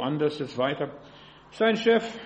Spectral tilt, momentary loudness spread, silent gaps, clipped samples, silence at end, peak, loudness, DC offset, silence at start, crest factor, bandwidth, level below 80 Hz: -6 dB/octave; 12 LU; none; under 0.1%; 0 s; -8 dBFS; -26 LUFS; under 0.1%; 0 s; 18 dB; 8.4 kHz; -66 dBFS